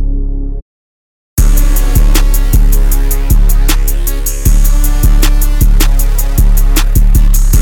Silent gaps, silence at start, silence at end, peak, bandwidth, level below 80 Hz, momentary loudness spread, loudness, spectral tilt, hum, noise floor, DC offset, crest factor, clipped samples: 0.62-1.37 s; 0 s; 0 s; 0 dBFS; 17.5 kHz; -8 dBFS; 5 LU; -12 LUFS; -4.5 dB/octave; none; under -90 dBFS; under 0.1%; 6 dB; under 0.1%